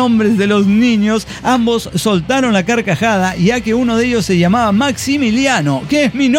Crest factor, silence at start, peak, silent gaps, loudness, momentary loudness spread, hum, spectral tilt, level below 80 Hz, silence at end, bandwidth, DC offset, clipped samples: 12 dB; 0 s; -2 dBFS; none; -13 LUFS; 4 LU; none; -5.5 dB/octave; -40 dBFS; 0 s; 16.5 kHz; under 0.1%; under 0.1%